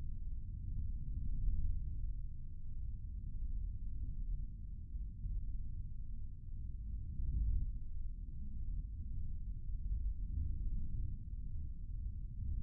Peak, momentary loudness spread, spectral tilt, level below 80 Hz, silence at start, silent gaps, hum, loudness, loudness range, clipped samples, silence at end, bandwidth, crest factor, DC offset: -24 dBFS; 7 LU; -21 dB/octave; -42 dBFS; 0 s; none; none; -46 LUFS; 3 LU; under 0.1%; 0 s; 0.5 kHz; 16 dB; under 0.1%